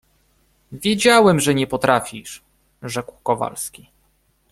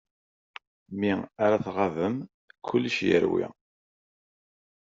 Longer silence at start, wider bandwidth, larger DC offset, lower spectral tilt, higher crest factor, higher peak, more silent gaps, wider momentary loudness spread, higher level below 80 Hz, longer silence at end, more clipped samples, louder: second, 0.7 s vs 0.9 s; first, 15.5 kHz vs 7.6 kHz; neither; about the same, -4 dB/octave vs -4.5 dB/octave; about the same, 20 dB vs 20 dB; first, 0 dBFS vs -10 dBFS; second, none vs 2.34-2.48 s; about the same, 22 LU vs 23 LU; first, -54 dBFS vs -66 dBFS; second, 0.85 s vs 1.35 s; neither; first, -18 LUFS vs -27 LUFS